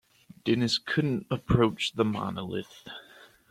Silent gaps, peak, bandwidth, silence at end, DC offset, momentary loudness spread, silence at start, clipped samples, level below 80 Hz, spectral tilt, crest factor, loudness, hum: none; -8 dBFS; 15 kHz; 0.5 s; under 0.1%; 18 LU; 0.45 s; under 0.1%; -52 dBFS; -5.5 dB/octave; 22 dB; -28 LUFS; none